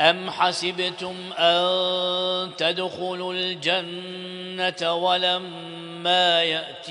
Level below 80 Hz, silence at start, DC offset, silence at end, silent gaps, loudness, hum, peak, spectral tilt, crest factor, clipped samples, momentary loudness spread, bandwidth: -74 dBFS; 0 s; under 0.1%; 0 s; none; -23 LUFS; none; -2 dBFS; -3.5 dB/octave; 22 dB; under 0.1%; 14 LU; 10.5 kHz